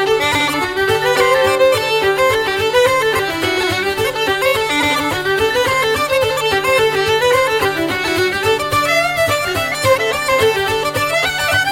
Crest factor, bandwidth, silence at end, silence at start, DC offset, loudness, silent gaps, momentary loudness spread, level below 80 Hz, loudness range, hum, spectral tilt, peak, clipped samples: 14 dB; 17 kHz; 0 s; 0 s; under 0.1%; -14 LUFS; none; 4 LU; -42 dBFS; 1 LU; none; -3 dB/octave; -2 dBFS; under 0.1%